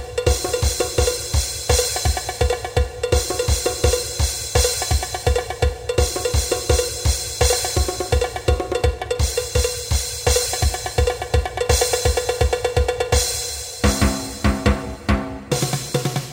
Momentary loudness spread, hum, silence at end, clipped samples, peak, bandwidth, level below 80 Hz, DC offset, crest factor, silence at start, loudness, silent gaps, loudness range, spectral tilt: 4 LU; none; 0 s; under 0.1%; -2 dBFS; 16.5 kHz; -24 dBFS; under 0.1%; 18 dB; 0 s; -20 LUFS; none; 1 LU; -3.5 dB/octave